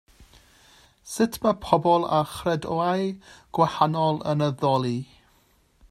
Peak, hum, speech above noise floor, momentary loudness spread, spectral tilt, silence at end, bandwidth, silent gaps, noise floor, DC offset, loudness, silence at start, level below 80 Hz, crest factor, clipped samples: -2 dBFS; none; 39 dB; 11 LU; -6 dB/octave; 0.85 s; 15 kHz; none; -62 dBFS; under 0.1%; -24 LUFS; 0.2 s; -56 dBFS; 22 dB; under 0.1%